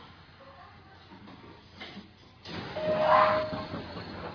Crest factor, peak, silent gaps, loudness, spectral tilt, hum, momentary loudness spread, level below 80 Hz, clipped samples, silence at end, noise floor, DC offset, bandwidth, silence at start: 22 dB; -10 dBFS; none; -28 LUFS; -6.5 dB/octave; none; 28 LU; -60 dBFS; under 0.1%; 0 s; -52 dBFS; under 0.1%; 5.4 kHz; 0 s